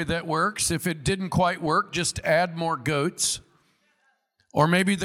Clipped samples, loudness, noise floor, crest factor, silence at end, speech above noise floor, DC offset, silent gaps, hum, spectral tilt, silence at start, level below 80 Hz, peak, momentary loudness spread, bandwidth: under 0.1%; -24 LUFS; -69 dBFS; 20 dB; 0 s; 44 dB; under 0.1%; none; none; -4 dB/octave; 0 s; -50 dBFS; -6 dBFS; 5 LU; 16.5 kHz